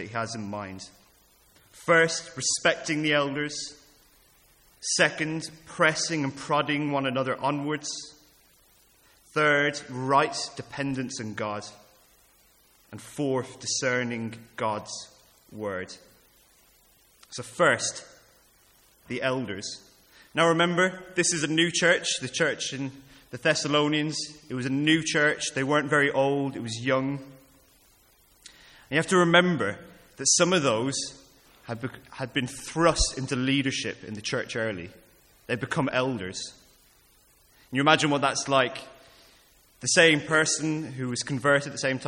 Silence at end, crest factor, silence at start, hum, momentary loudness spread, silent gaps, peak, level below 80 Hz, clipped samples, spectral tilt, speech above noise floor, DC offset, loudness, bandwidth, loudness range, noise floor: 0 s; 24 dB; 0 s; none; 16 LU; none; -4 dBFS; -52 dBFS; under 0.1%; -3.5 dB/octave; 35 dB; under 0.1%; -26 LUFS; 17 kHz; 7 LU; -61 dBFS